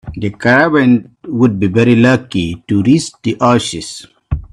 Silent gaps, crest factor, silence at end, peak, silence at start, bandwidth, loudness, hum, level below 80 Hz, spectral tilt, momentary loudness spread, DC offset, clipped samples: none; 12 dB; 0.1 s; 0 dBFS; 0.05 s; 11 kHz; -13 LUFS; none; -36 dBFS; -6 dB/octave; 14 LU; under 0.1%; under 0.1%